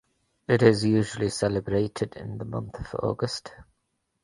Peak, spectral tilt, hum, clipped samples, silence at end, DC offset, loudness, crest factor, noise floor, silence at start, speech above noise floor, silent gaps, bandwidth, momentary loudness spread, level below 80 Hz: -4 dBFS; -6 dB/octave; none; under 0.1%; 0.6 s; under 0.1%; -26 LUFS; 22 dB; -77 dBFS; 0.5 s; 51 dB; none; 11.5 kHz; 15 LU; -50 dBFS